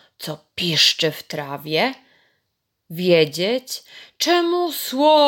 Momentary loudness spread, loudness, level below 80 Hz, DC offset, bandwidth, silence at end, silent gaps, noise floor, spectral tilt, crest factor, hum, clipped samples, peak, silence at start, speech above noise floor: 16 LU; -19 LUFS; -70 dBFS; under 0.1%; 17 kHz; 0 s; none; -75 dBFS; -3.5 dB/octave; 18 dB; none; under 0.1%; -4 dBFS; 0.2 s; 55 dB